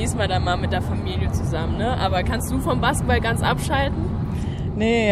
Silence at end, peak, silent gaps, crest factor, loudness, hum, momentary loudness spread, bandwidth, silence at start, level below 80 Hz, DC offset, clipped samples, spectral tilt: 0 s; -4 dBFS; none; 16 dB; -22 LUFS; none; 5 LU; 15 kHz; 0 s; -30 dBFS; under 0.1%; under 0.1%; -5.5 dB/octave